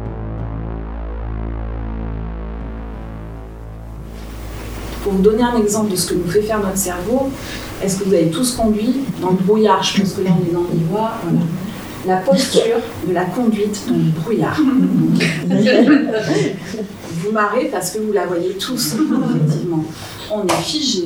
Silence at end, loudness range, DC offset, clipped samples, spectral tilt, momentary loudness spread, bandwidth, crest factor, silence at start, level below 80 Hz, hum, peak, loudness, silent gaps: 0 s; 12 LU; 0.1%; under 0.1%; -5.5 dB/octave; 15 LU; over 20 kHz; 18 dB; 0 s; -34 dBFS; none; 0 dBFS; -17 LUFS; none